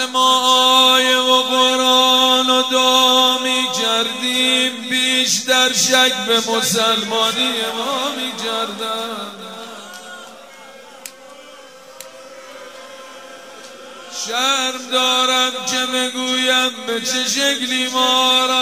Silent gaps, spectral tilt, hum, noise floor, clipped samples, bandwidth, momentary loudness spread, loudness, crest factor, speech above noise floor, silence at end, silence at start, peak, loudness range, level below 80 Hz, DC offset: none; -0.5 dB/octave; none; -40 dBFS; under 0.1%; 16 kHz; 24 LU; -14 LUFS; 18 dB; 23 dB; 0 s; 0 s; 0 dBFS; 23 LU; -72 dBFS; 0.2%